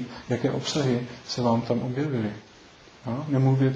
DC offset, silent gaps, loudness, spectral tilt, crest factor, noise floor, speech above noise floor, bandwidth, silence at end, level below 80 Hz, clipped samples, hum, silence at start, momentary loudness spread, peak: under 0.1%; none; -27 LUFS; -6.5 dB/octave; 16 dB; -51 dBFS; 26 dB; 7.8 kHz; 0 s; -60 dBFS; under 0.1%; none; 0 s; 10 LU; -10 dBFS